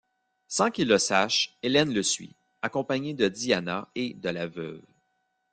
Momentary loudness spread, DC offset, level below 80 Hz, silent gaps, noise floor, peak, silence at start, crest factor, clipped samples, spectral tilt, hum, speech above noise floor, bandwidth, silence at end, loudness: 11 LU; under 0.1%; -66 dBFS; none; -75 dBFS; -6 dBFS; 0.5 s; 22 dB; under 0.1%; -3 dB/octave; none; 48 dB; 10 kHz; 0.75 s; -26 LUFS